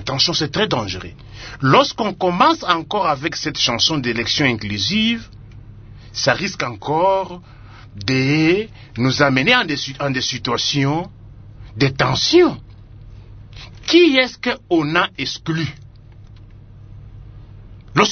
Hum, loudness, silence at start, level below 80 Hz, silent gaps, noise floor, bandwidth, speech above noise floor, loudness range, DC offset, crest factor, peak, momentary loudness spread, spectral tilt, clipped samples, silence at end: none; -17 LUFS; 0 s; -44 dBFS; none; -41 dBFS; 6.6 kHz; 23 dB; 4 LU; under 0.1%; 20 dB; 0 dBFS; 14 LU; -4.5 dB/octave; under 0.1%; 0 s